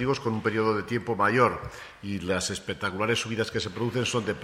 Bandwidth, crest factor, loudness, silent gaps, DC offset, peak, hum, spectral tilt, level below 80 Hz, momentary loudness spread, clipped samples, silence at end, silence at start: 15.5 kHz; 20 dB; -27 LUFS; none; under 0.1%; -6 dBFS; none; -4.5 dB/octave; -54 dBFS; 10 LU; under 0.1%; 0 s; 0 s